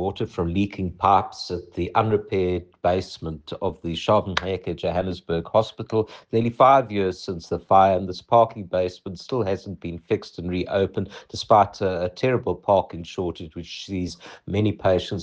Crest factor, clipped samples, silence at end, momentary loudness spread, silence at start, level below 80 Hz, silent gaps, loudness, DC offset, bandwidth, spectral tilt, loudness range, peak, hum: 20 dB; under 0.1%; 0 s; 13 LU; 0 s; -50 dBFS; none; -23 LUFS; under 0.1%; 8.8 kHz; -6.5 dB/octave; 5 LU; -4 dBFS; none